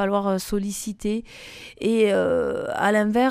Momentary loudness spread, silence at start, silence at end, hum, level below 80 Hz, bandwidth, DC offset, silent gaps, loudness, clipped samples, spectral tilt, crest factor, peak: 12 LU; 0 s; 0 s; none; -48 dBFS; 15.5 kHz; under 0.1%; none; -23 LUFS; under 0.1%; -5 dB/octave; 16 dB; -8 dBFS